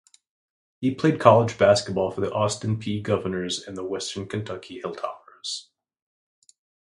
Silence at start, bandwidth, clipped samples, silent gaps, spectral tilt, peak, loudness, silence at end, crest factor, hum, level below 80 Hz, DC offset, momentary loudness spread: 0.8 s; 11.5 kHz; under 0.1%; none; -5.5 dB/octave; 0 dBFS; -24 LUFS; 1.3 s; 24 dB; none; -56 dBFS; under 0.1%; 16 LU